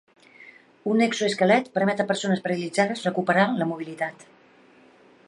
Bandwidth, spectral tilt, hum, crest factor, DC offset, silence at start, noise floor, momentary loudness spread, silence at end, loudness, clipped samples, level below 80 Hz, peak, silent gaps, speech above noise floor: 11.5 kHz; -5 dB/octave; none; 20 dB; under 0.1%; 0.4 s; -55 dBFS; 10 LU; 1.15 s; -24 LUFS; under 0.1%; -74 dBFS; -6 dBFS; none; 31 dB